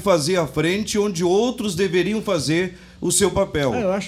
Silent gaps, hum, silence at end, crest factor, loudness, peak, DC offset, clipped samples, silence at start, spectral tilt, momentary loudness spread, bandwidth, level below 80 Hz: none; none; 0 s; 16 dB; -20 LUFS; -4 dBFS; under 0.1%; under 0.1%; 0 s; -4.5 dB/octave; 4 LU; 16 kHz; -46 dBFS